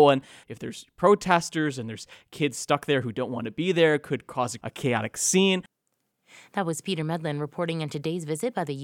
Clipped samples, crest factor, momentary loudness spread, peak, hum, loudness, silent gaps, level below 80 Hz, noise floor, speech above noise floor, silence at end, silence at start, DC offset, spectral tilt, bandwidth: under 0.1%; 20 dB; 14 LU; -6 dBFS; none; -26 LUFS; none; -66 dBFS; -77 dBFS; 51 dB; 0 s; 0 s; under 0.1%; -4.5 dB/octave; 17 kHz